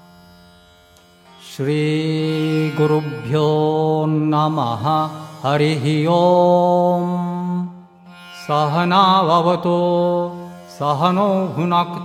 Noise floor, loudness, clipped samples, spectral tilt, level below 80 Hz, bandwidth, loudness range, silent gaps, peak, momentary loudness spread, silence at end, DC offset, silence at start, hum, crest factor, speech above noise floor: -49 dBFS; -17 LUFS; under 0.1%; -7.5 dB/octave; -62 dBFS; 14 kHz; 3 LU; none; 0 dBFS; 12 LU; 0 s; under 0.1%; 1.4 s; none; 18 dB; 33 dB